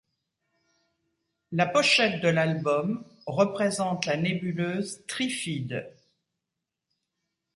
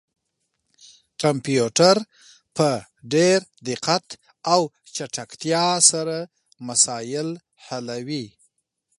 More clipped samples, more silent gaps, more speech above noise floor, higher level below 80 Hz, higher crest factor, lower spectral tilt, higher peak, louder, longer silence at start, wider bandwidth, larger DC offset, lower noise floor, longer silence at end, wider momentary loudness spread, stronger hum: neither; neither; first, 60 dB vs 54 dB; about the same, -70 dBFS vs -68 dBFS; about the same, 22 dB vs 24 dB; first, -4.5 dB/octave vs -3 dB/octave; second, -8 dBFS vs 0 dBFS; second, -26 LUFS vs -21 LUFS; first, 1.5 s vs 1.2 s; about the same, 11.5 kHz vs 11.5 kHz; neither; first, -86 dBFS vs -76 dBFS; first, 1.65 s vs 0.7 s; second, 13 LU vs 18 LU; neither